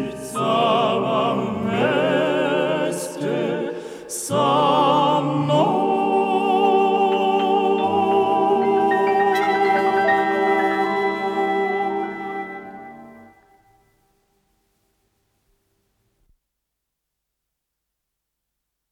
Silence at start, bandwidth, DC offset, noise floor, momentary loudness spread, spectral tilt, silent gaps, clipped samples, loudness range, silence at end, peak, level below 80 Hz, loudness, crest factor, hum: 0 s; 14 kHz; under 0.1%; -80 dBFS; 10 LU; -5 dB/octave; none; under 0.1%; 8 LU; 5.7 s; -6 dBFS; -64 dBFS; -20 LUFS; 14 dB; none